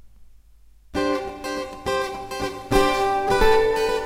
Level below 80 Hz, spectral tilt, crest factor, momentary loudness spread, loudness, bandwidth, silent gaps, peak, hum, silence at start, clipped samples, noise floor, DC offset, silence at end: -34 dBFS; -4 dB/octave; 18 dB; 12 LU; -23 LUFS; 16 kHz; none; -4 dBFS; none; 0.05 s; under 0.1%; -50 dBFS; under 0.1%; 0 s